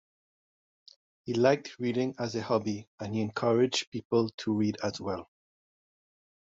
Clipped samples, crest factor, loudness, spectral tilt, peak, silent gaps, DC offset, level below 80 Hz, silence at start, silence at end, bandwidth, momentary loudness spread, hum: under 0.1%; 20 dB; -30 LUFS; -5 dB/octave; -12 dBFS; 2.87-2.98 s, 3.87-3.92 s, 4.05-4.10 s, 4.34-4.38 s; under 0.1%; -70 dBFS; 1.25 s; 1.2 s; 8 kHz; 11 LU; none